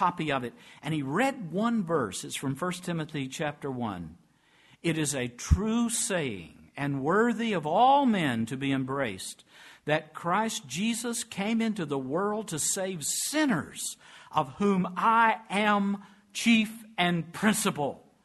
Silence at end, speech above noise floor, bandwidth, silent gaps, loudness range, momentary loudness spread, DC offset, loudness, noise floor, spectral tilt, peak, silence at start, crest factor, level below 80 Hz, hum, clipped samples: 0.25 s; 34 dB; 12.5 kHz; none; 5 LU; 11 LU; under 0.1%; -28 LUFS; -62 dBFS; -4 dB/octave; -8 dBFS; 0 s; 20 dB; -46 dBFS; none; under 0.1%